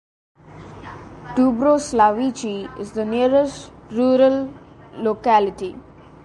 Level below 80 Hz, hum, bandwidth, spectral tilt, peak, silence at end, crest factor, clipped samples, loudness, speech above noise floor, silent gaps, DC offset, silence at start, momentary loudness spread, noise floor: -50 dBFS; none; 11.5 kHz; -5.5 dB/octave; -2 dBFS; 0.45 s; 18 dB; under 0.1%; -19 LUFS; 21 dB; none; under 0.1%; 0.55 s; 21 LU; -40 dBFS